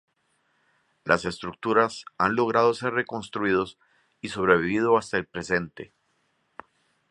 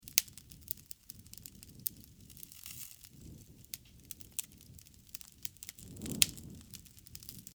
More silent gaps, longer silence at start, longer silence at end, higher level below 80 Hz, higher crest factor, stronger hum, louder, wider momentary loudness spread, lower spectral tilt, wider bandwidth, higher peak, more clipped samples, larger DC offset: neither; first, 1.05 s vs 0 s; first, 1.25 s vs 0.05 s; about the same, -58 dBFS vs -62 dBFS; second, 24 dB vs 42 dB; neither; first, -25 LUFS vs -39 LUFS; second, 14 LU vs 23 LU; first, -5.5 dB/octave vs -1 dB/octave; second, 11 kHz vs over 20 kHz; about the same, -2 dBFS vs 0 dBFS; neither; neither